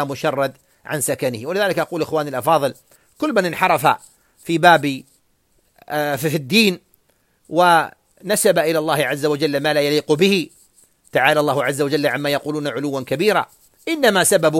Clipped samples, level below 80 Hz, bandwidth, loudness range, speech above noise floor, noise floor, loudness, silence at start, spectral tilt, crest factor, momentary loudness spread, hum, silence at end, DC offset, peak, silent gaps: under 0.1%; -62 dBFS; 16.5 kHz; 2 LU; 44 dB; -62 dBFS; -18 LUFS; 0 s; -4 dB/octave; 18 dB; 11 LU; none; 0 s; under 0.1%; 0 dBFS; none